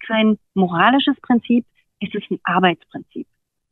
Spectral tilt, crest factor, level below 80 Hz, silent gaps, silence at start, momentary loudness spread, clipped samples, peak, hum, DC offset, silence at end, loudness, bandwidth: -8.5 dB/octave; 18 dB; -62 dBFS; none; 0 s; 18 LU; under 0.1%; -2 dBFS; none; under 0.1%; 0.5 s; -18 LUFS; 4.1 kHz